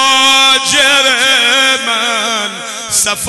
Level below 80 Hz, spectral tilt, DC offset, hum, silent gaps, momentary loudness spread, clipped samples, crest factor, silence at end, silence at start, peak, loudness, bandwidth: -50 dBFS; 0.5 dB/octave; under 0.1%; none; none; 9 LU; under 0.1%; 10 dB; 0 s; 0 s; 0 dBFS; -8 LUFS; 12.5 kHz